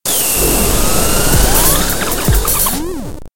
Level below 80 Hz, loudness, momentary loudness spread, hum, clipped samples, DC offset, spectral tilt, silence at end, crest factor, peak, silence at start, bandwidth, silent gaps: -18 dBFS; -12 LUFS; 6 LU; none; under 0.1%; 8%; -3 dB/octave; 0 s; 14 dB; 0 dBFS; 0 s; 17.5 kHz; none